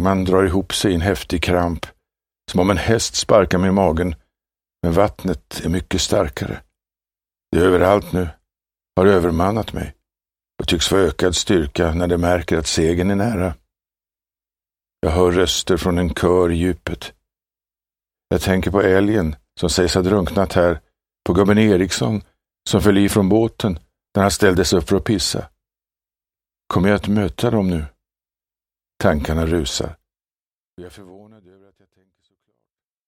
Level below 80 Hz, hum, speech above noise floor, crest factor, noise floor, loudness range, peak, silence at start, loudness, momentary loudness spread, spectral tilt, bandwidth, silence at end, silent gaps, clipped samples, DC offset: -36 dBFS; none; over 73 dB; 18 dB; under -90 dBFS; 5 LU; 0 dBFS; 0 s; -18 LUFS; 11 LU; -5 dB/octave; 16.5 kHz; 1.9 s; 30.42-30.77 s; under 0.1%; under 0.1%